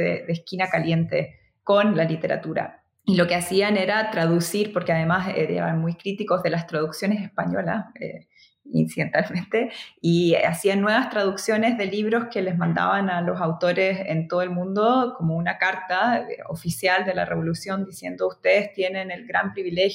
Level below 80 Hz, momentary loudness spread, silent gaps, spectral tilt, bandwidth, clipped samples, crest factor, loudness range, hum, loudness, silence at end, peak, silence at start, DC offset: -62 dBFS; 9 LU; none; -6 dB/octave; 16 kHz; under 0.1%; 16 dB; 4 LU; none; -23 LUFS; 0 s; -6 dBFS; 0 s; under 0.1%